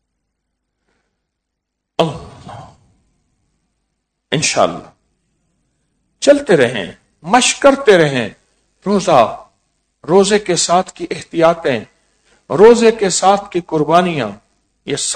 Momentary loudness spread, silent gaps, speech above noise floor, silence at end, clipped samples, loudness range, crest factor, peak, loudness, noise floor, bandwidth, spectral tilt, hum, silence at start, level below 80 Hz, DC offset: 19 LU; none; 63 dB; 0 s; 0.5%; 14 LU; 16 dB; 0 dBFS; -13 LUFS; -76 dBFS; 11 kHz; -4 dB/octave; none; 2 s; -50 dBFS; under 0.1%